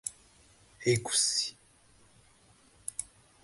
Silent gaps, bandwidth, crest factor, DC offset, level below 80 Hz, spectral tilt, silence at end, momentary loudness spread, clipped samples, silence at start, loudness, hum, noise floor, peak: none; 12 kHz; 22 dB; under 0.1%; -66 dBFS; -2.5 dB/octave; 0.4 s; 16 LU; under 0.1%; 0.05 s; -31 LUFS; none; -62 dBFS; -14 dBFS